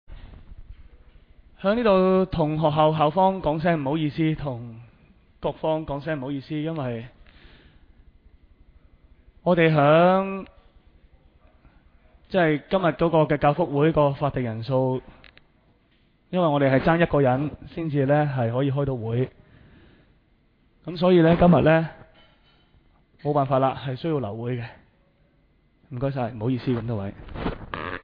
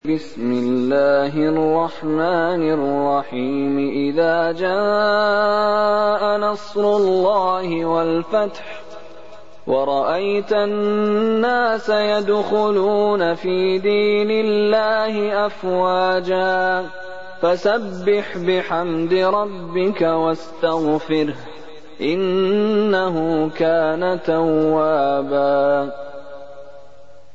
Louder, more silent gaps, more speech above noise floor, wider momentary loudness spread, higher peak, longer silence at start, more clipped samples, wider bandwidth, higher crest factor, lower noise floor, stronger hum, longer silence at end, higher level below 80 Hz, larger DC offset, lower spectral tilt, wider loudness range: second, -23 LUFS vs -18 LUFS; neither; first, 40 dB vs 29 dB; first, 14 LU vs 6 LU; about the same, -4 dBFS vs -6 dBFS; about the same, 0.1 s vs 0 s; neither; second, 5.2 kHz vs 7.8 kHz; first, 20 dB vs 14 dB; first, -62 dBFS vs -47 dBFS; neither; second, 0.05 s vs 0.55 s; first, -46 dBFS vs -64 dBFS; second, under 0.1% vs 2%; first, -10.5 dB/octave vs -6.5 dB/octave; first, 9 LU vs 3 LU